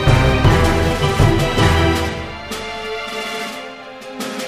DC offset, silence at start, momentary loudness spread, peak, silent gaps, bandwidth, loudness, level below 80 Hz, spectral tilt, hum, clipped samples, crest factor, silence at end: under 0.1%; 0 s; 14 LU; 0 dBFS; none; 15.5 kHz; -17 LUFS; -24 dBFS; -5.5 dB/octave; none; under 0.1%; 16 dB; 0 s